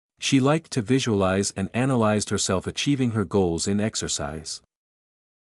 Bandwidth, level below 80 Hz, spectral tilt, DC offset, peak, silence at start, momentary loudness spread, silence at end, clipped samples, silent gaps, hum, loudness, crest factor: 12 kHz; -52 dBFS; -4.5 dB/octave; under 0.1%; -8 dBFS; 0.2 s; 6 LU; 0.9 s; under 0.1%; none; none; -23 LUFS; 16 dB